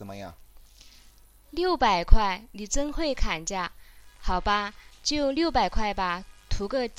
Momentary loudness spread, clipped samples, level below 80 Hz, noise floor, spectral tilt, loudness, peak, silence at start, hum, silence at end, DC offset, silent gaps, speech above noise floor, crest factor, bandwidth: 13 LU; under 0.1%; -30 dBFS; -54 dBFS; -4 dB/octave; -28 LUFS; 0 dBFS; 0 s; none; 0.05 s; under 0.1%; none; 30 dB; 24 dB; 10.5 kHz